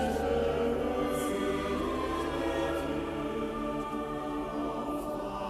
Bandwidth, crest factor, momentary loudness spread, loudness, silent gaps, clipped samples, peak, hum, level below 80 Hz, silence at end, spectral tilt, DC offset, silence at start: 15.5 kHz; 14 dB; 5 LU; -32 LUFS; none; under 0.1%; -18 dBFS; none; -46 dBFS; 0 s; -5.5 dB/octave; under 0.1%; 0 s